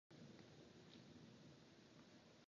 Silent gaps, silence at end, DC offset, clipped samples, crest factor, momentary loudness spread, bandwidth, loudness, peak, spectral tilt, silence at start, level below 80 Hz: none; 0 s; under 0.1%; under 0.1%; 16 dB; 3 LU; 7.2 kHz; -65 LUFS; -50 dBFS; -4.5 dB/octave; 0.1 s; -86 dBFS